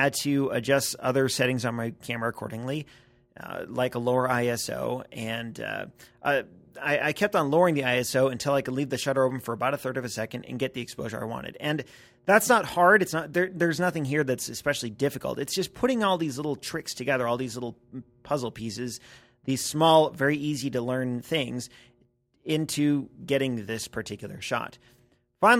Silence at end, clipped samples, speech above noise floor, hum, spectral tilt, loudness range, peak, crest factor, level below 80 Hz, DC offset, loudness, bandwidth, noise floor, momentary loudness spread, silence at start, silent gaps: 0 s; under 0.1%; 40 dB; none; -4.5 dB/octave; 6 LU; -4 dBFS; 22 dB; -62 dBFS; under 0.1%; -27 LUFS; 16.5 kHz; -66 dBFS; 13 LU; 0 s; none